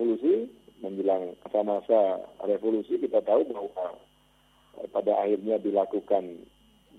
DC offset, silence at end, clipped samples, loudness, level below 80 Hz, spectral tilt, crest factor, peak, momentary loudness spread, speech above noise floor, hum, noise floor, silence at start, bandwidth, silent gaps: under 0.1%; 0.6 s; under 0.1%; -27 LUFS; -70 dBFS; -8 dB/octave; 18 dB; -10 dBFS; 13 LU; 36 dB; none; -63 dBFS; 0 s; 4.5 kHz; none